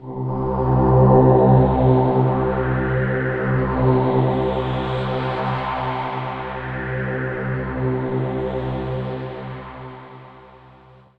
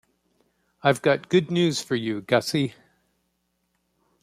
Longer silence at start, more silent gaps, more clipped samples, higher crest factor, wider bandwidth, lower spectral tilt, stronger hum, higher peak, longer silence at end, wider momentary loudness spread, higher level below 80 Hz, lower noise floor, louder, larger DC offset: second, 0 s vs 0.85 s; neither; neither; second, 16 dB vs 22 dB; second, 4.7 kHz vs 15 kHz; first, -10.5 dB/octave vs -5 dB/octave; neither; about the same, -2 dBFS vs -4 dBFS; second, 0.6 s vs 1.5 s; first, 14 LU vs 6 LU; first, -34 dBFS vs -66 dBFS; second, -48 dBFS vs -74 dBFS; first, -20 LUFS vs -24 LUFS; neither